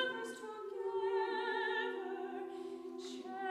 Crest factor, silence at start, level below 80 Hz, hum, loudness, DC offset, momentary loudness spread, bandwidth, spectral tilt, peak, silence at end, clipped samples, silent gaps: 16 dB; 0 s; -88 dBFS; none; -40 LUFS; under 0.1%; 10 LU; 12.5 kHz; -2.5 dB/octave; -24 dBFS; 0 s; under 0.1%; none